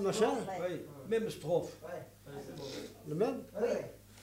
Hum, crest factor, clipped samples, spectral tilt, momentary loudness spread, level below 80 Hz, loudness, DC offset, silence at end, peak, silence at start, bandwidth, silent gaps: none; 20 dB; under 0.1%; -5.5 dB/octave; 14 LU; -66 dBFS; -37 LUFS; under 0.1%; 0 s; -18 dBFS; 0 s; 16 kHz; none